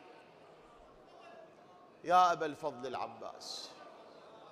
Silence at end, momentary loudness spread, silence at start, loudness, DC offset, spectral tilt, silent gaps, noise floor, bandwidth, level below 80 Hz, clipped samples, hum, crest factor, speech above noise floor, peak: 0.05 s; 28 LU; 0 s; -34 LUFS; under 0.1%; -3.5 dB/octave; none; -59 dBFS; 13 kHz; -78 dBFS; under 0.1%; none; 24 dB; 25 dB; -14 dBFS